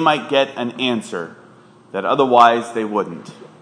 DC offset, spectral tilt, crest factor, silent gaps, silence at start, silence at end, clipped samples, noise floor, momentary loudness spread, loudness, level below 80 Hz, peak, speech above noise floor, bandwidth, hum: under 0.1%; -5 dB/octave; 18 dB; none; 0 s; 0.25 s; under 0.1%; -46 dBFS; 17 LU; -17 LUFS; -72 dBFS; 0 dBFS; 29 dB; 10.5 kHz; none